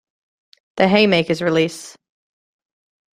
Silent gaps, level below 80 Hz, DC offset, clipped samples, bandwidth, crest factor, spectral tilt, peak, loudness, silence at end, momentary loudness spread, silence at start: none; -58 dBFS; under 0.1%; under 0.1%; 14.5 kHz; 20 dB; -5.5 dB/octave; -2 dBFS; -17 LUFS; 1.25 s; 17 LU; 0.75 s